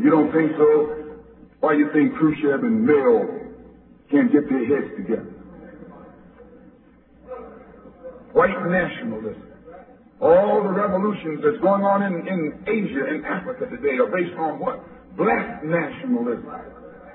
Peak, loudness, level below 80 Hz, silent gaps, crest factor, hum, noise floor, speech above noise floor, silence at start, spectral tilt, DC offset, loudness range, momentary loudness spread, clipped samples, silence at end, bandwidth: -4 dBFS; -21 LUFS; -56 dBFS; none; 18 dB; none; -52 dBFS; 32 dB; 0 s; -11.5 dB/octave; under 0.1%; 7 LU; 23 LU; under 0.1%; 0 s; 4.1 kHz